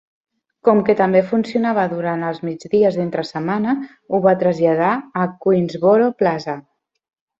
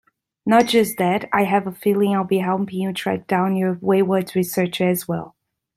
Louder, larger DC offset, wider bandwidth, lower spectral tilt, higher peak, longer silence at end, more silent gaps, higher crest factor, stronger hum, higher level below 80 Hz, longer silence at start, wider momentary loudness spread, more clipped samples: about the same, -18 LUFS vs -20 LUFS; neither; second, 7.8 kHz vs 16 kHz; first, -8 dB/octave vs -5.5 dB/octave; about the same, -2 dBFS vs -2 dBFS; first, 0.8 s vs 0.5 s; neither; about the same, 16 dB vs 18 dB; neither; about the same, -60 dBFS vs -62 dBFS; first, 0.65 s vs 0.45 s; about the same, 8 LU vs 7 LU; neither